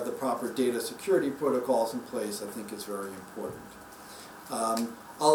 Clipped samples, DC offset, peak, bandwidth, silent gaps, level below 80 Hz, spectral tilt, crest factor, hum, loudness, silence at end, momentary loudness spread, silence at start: under 0.1%; under 0.1%; -8 dBFS; over 20 kHz; none; -70 dBFS; -4 dB/octave; 22 dB; none; -31 LUFS; 0 s; 18 LU; 0 s